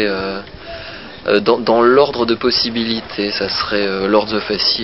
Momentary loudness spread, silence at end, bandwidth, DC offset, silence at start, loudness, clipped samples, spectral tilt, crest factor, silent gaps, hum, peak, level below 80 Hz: 17 LU; 0 s; 5.8 kHz; 0.5%; 0 s; -15 LUFS; under 0.1%; -7.5 dB/octave; 16 dB; none; none; 0 dBFS; -46 dBFS